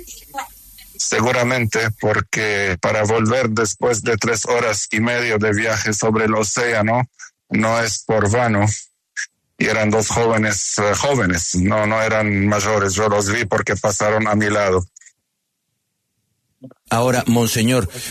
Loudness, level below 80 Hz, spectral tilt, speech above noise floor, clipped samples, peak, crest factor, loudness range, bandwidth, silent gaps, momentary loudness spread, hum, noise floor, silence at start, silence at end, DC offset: -17 LUFS; -46 dBFS; -4 dB/octave; 56 dB; under 0.1%; -4 dBFS; 14 dB; 4 LU; 13.5 kHz; none; 6 LU; none; -74 dBFS; 0 s; 0 s; under 0.1%